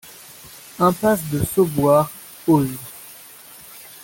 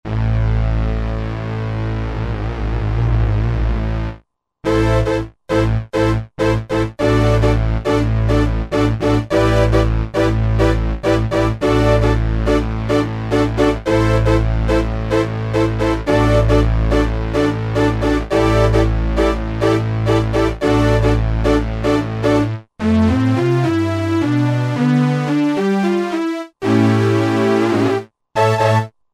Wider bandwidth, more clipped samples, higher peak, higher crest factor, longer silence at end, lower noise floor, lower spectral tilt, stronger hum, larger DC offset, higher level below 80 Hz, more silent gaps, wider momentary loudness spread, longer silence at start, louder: first, 17 kHz vs 11.5 kHz; neither; about the same, -4 dBFS vs -2 dBFS; about the same, 18 dB vs 14 dB; second, 0.05 s vs 0.25 s; second, -42 dBFS vs -46 dBFS; about the same, -6.5 dB/octave vs -7.5 dB/octave; neither; neither; second, -48 dBFS vs -22 dBFS; neither; first, 22 LU vs 7 LU; about the same, 0.05 s vs 0.05 s; about the same, -19 LUFS vs -17 LUFS